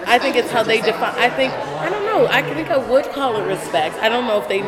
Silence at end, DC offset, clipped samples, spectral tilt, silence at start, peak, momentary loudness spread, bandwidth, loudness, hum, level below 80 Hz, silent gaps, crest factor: 0 s; under 0.1%; under 0.1%; -4 dB/octave; 0 s; 0 dBFS; 5 LU; 16.5 kHz; -18 LUFS; none; -54 dBFS; none; 18 dB